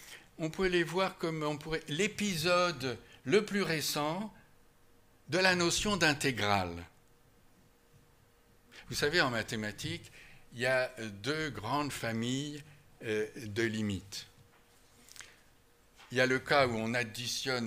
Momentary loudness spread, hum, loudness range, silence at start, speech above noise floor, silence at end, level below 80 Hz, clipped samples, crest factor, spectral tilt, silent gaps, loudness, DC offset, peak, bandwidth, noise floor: 15 LU; none; 6 LU; 0 s; 32 dB; 0 s; -60 dBFS; under 0.1%; 24 dB; -4 dB/octave; none; -32 LUFS; under 0.1%; -12 dBFS; 16 kHz; -65 dBFS